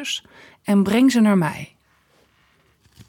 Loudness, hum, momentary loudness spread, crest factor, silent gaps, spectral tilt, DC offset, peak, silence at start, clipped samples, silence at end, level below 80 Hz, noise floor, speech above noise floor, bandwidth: -18 LUFS; none; 19 LU; 14 dB; none; -5.5 dB/octave; under 0.1%; -8 dBFS; 0 s; under 0.1%; 1.45 s; -60 dBFS; -60 dBFS; 41 dB; 17 kHz